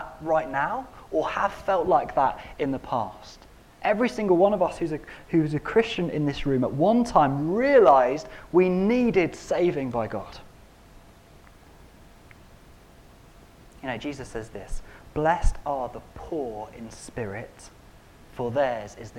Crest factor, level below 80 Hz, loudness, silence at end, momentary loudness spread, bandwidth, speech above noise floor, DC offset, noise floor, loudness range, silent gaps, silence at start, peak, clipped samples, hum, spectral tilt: 20 dB; -40 dBFS; -25 LUFS; 0 s; 17 LU; 14.5 kHz; 27 dB; under 0.1%; -51 dBFS; 17 LU; none; 0 s; -6 dBFS; under 0.1%; none; -6.5 dB/octave